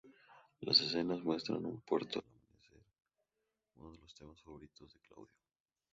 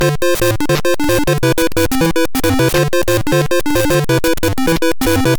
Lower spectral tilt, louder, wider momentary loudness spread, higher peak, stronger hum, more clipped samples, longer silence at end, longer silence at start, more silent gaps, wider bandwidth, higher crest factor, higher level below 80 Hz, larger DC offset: second, -3 dB/octave vs -5 dB/octave; second, -36 LUFS vs -14 LUFS; first, 27 LU vs 2 LU; second, -16 dBFS vs -4 dBFS; neither; neither; first, 0.7 s vs 0 s; about the same, 0.05 s vs 0 s; neither; second, 7.6 kHz vs over 20 kHz; first, 26 dB vs 10 dB; second, -72 dBFS vs -28 dBFS; second, under 0.1% vs 7%